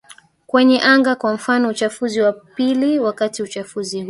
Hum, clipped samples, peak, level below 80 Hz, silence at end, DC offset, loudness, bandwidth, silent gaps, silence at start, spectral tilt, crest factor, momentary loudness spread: none; under 0.1%; -2 dBFS; -64 dBFS; 0 s; under 0.1%; -17 LUFS; 11.5 kHz; none; 0.55 s; -4 dB/octave; 16 dB; 12 LU